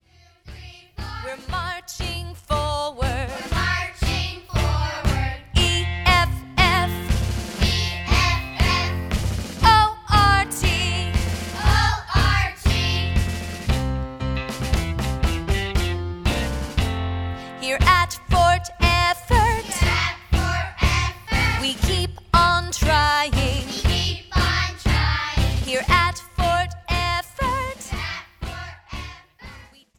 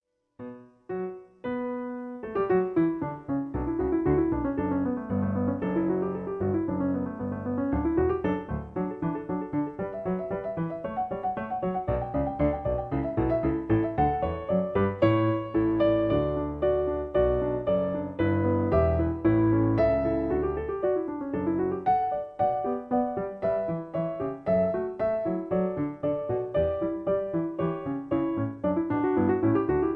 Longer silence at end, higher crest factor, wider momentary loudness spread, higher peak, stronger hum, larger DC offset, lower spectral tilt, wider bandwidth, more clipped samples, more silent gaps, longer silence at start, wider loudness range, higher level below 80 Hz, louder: first, 0.35 s vs 0 s; about the same, 20 dB vs 16 dB; first, 11 LU vs 8 LU; first, -2 dBFS vs -10 dBFS; neither; neither; second, -4.5 dB/octave vs -11 dB/octave; first, 18 kHz vs 4.8 kHz; neither; neither; about the same, 0.45 s vs 0.4 s; about the same, 6 LU vs 5 LU; first, -28 dBFS vs -44 dBFS; first, -21 LUFS vs -28 LUFS